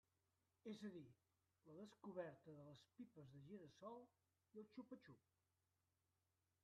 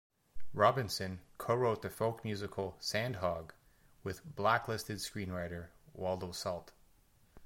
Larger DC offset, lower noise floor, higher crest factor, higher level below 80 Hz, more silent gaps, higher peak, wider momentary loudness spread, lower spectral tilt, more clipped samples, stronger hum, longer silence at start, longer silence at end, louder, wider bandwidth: neither; first, under -90 dBFS vs -67 dBFS; about the same, 22 dB vs 24 dB; second, under -90 dBFS vs -62 dBFS; neither; second, -40 dBFS vs -14 dBFS; second, 9 LU vs 14 LU; about the same, -6 dB/octave vs -5 dB/octave; neither; neither; first, 0.65 s vs 0.35 s; first, 1.45 s vs 0 s; second, -61 LUFS vs -37 LUFS; second, 7.4 kHz vs 16.5 kHz